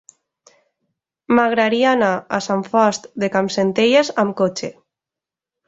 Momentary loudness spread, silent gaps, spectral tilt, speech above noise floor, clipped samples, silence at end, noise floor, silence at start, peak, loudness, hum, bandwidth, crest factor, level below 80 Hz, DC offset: 7 LU; none; -4.5 dB/octave; 70 dB; under 0.1%; 0.95 s; -87 dBFS; 1.3 s; -2 dBFS; -17 LUFS; none; 8 kHz; 18 dB; -62 dBFS; under 0.1%